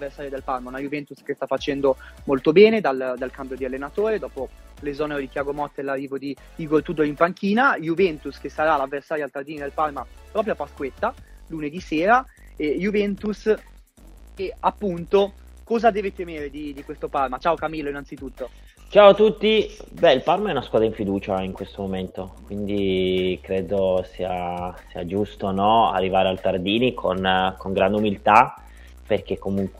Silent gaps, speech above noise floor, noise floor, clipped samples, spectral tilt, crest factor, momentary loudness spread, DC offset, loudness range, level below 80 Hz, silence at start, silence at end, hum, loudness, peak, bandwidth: none; 25 dB; -47 dBFS; under 0.1%; -6.5 dB/octave; 22 dB; 15 LU; under 0.1%; 7 LU; -46 dBFS; 0 s; 0 s; none; -22 LUFS; 0 dBFS; 14 kHz